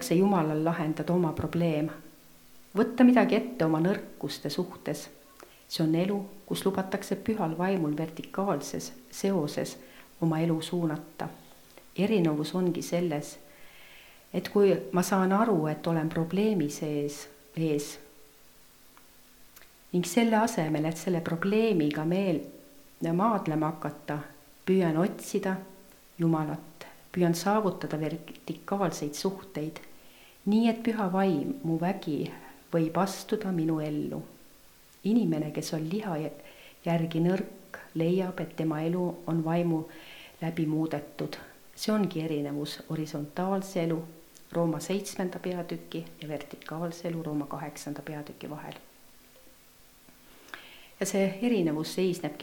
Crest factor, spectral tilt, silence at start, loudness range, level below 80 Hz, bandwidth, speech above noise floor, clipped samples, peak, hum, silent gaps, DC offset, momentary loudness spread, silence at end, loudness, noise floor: 22 dB; -6 dB/octave; 0 s; 7 LU; -64 dBFS; 19 kHz; 28 dB; under 0.1%; -8 dBFS; none; none; under 0.1%; 15 LU; 0 s; -30 LUFS; -57 dBFS